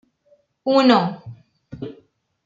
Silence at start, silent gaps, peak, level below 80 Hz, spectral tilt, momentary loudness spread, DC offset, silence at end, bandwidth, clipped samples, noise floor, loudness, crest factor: 0.65 s; none; -2 dBFS; -62 dBFS; -6.5 dB/octave; 21 LU; under 0.1%; 0.55 s; 7.6 kHz; under 0.1%; -60 dBFS; -18 LUFS; 20 dB